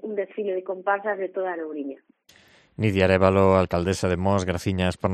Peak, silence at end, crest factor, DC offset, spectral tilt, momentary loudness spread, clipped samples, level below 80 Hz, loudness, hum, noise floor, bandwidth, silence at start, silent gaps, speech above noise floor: -2 dBFS; 0 s; 20 dB; under 0.1%; -6.5 dB/octave; 12 LU; under 0.1%; -50 dBFS; -23 LUFS; none; -56 dBFS; 13 kHz; 0.05 s; none; 33 dB